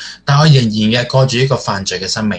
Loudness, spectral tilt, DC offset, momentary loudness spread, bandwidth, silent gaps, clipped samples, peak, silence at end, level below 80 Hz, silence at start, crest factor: -13 LUFS; -5.5 dB/octave; under 0.1%; 8 LU; 9.2 kHz; none; under 0.1%; 0 dBFS; 0 s; -44 dBFS; 0 s; 12 dB